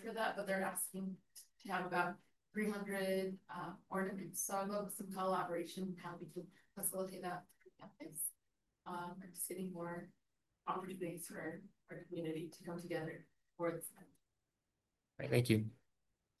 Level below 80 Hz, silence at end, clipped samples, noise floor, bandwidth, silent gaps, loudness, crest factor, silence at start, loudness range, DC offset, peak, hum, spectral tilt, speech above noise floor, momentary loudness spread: -78 dBFS; 0.65 s; under 0.1%; -89 dBFS; 12.5 kHz; none; -43 LUFS; 24 dB; 0 s; 6 LU; under 0.1%; -20 dBFS; none; -4.5 dB/octave; 47 dB; 14 LU